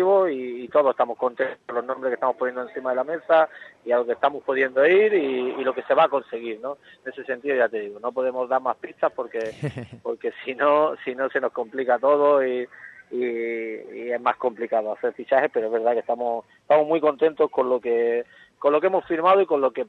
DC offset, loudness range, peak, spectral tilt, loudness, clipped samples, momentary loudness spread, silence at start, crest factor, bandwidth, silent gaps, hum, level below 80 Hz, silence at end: under 0.1%; 4 LU; -6 dBFS; -7 dB/octave; -23 LUFS; under 0.1%; 12 LU; 0 s; 18 dB; 6.2 kHz; none; none; -72 dBFS; 0.05 s